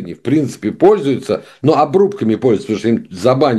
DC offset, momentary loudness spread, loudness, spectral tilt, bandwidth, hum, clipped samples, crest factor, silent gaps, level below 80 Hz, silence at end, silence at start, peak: under 0.1%; 6 LU; -15 LUFS; -7 dB/octave; 12.5 kHz; none; under 0.1%; 14 dB; none; -54 dBFS; 0 s; 0 s; 0 dBFS